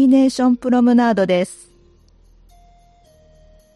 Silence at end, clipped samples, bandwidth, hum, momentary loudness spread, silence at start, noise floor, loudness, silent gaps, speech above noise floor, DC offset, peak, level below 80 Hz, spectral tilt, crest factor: 2.2 s; under 0.1%; 11.5 kHz; none; 6 LU; 0 s; -51 dBFS; -16 LUFS; none; 36 dB; under 0.1%; -4 dBFS; -52 dBFS; -6 dB/octave; 14 dB